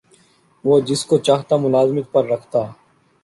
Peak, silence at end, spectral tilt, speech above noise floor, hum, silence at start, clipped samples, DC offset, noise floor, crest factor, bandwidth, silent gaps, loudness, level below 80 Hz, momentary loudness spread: -2 dBFS; 0.5 s; -6 dB/octave; 38 dB; none; 0.65 s; under 0.1%; under 0.1%; -55 dBFS; 16 dB; 11.5 kHz; none; -18 LUFS; -60 dBFS; 7 LU